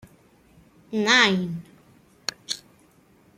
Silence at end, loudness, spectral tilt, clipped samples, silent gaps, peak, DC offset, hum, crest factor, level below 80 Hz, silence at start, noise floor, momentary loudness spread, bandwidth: 0.8 s; -23 LUFS; -3 dB/octave; under 0.1%; none; -4 dBFS; under 0.1%; none; 24 dB; -66 dBFS; 0.9 s; -58 dBFS; 16 LU; 15.5 kHz